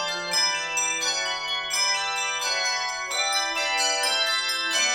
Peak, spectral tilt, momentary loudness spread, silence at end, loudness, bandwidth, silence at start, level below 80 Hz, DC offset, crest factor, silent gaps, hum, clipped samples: -10 dBFS; 2 dB/octave; 4 LU; 0 s; -23 LUFS; 18 kHz; 0 s; -62 dBFS; under 0.1%; 16 dB; none; none; under 0.1%